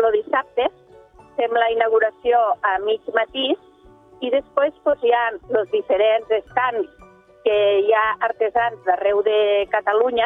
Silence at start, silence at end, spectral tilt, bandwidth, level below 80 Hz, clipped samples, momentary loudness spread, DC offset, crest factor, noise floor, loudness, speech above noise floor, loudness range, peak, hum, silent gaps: 0 s; 0 s; -5.5 dB/octave; 3.9 kHz; -58 dBFS; under 0.1%; 6 LU; under 0.1%; 16 dB; -48 dBFS; -20 LUFS; 29 dB; 2 LU; -4 dBFS; none; none